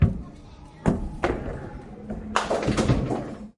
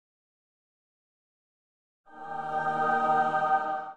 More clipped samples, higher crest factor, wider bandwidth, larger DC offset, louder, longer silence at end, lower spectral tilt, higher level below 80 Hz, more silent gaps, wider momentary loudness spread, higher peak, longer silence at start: neither; first, 24 dB vs 18 dB; first, 11.5 kHz vs 8.4 kHz; neither; about the same, -27 LUFS vs -27 LUFS; about the same, 0.05 s vs 0 s; about the same, -6.5 dB/octave vs -5.5 dB/octave; first, -36 dBFS vs -72 dBFS; neither; first, 17 LU vs 13 LU; first, -4 dBFS vs -12 dBFS; second, 0 s vs 2.1 s